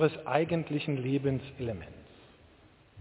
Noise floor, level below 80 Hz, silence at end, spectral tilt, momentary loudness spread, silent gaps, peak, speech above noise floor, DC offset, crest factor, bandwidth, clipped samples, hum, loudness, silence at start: -60 dBFS; -58 dBFS; 0 s; -6.5 dB/octave; 15 LU; none; -10 dBFS; 29 dB; under 0.1%; 22 dB; 4 kHz; under 0.1%; none; -32 LUFS; 0 s